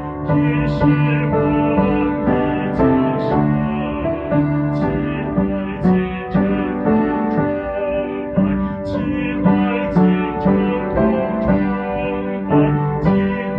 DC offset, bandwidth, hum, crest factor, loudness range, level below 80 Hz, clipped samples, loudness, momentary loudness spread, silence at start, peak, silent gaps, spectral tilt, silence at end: under 0.1%; 5.4 kHz; none; 14 dB; 2 LU; -36 dBFS; under 0.1%; -18 LUFS; 6 LU; 0 s; -4 dBFS; none; -10.5 dB/octave; 0 s